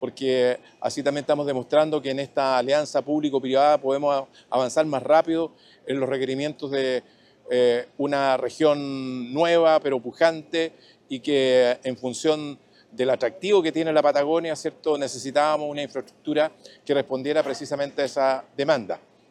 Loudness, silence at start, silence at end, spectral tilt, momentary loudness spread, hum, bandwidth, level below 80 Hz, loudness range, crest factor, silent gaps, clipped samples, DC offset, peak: -23 LUFS; 0 s; 0.35 s; -4.5 dB/octave; 10 LU; none; 11.5 kHz; -74 dBFS; 3 LU; 18 dB; none; under 0.1%; under 0.1%; -6 dBFS